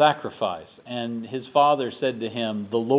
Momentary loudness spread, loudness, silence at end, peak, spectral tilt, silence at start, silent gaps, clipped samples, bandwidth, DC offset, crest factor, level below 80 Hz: 12 LU; -25 LUFS; 0 s; -6 dBFS; -9.5 dB/octave; 0 s; none; under 0.1%; 4 kHz; under 0.1%; 18 dB; -68 dBFS